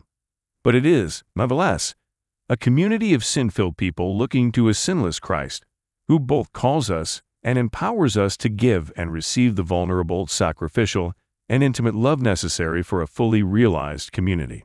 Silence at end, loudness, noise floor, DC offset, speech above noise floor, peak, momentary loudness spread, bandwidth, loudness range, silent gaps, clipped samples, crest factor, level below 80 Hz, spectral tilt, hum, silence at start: 0.05 s; -21 LUFS; -86 dBFS; under 0.1%; 66 dB; -4 dBFS; 7 LU; 12 kHz; 2 LU; none; under 0.1%; 16 dB; -44 dBFS; -5.5 dB/octave; none; 0.65 s